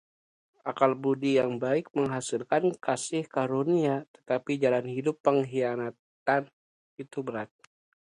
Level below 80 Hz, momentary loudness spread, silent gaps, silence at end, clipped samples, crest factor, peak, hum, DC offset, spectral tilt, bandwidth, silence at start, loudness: -76 dBFS; 12 LU; 4.08-4.14 s, 5.20-5.24 s, 5.99-6.26 s, 6.53-6.97 s; 0.75 s; under 0.1%; 20 dB; -8 dBFS; none; under 0.1%; -5.5 dB/octave; 11.5 kHz; 0.65 s; -29 LUFS